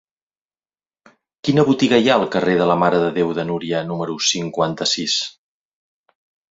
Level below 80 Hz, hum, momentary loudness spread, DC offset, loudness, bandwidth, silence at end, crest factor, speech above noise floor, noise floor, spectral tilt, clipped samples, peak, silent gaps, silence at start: -58 dBFS; none; 8 LU; under 0.1%; -18 LUFS; 7.8 kHz; 1.2 s; 20 dB; over 72 dB; under -90 dBFS; -4.5 dB/octave; under 0.1%; 0 dBFS; none; 1.45 s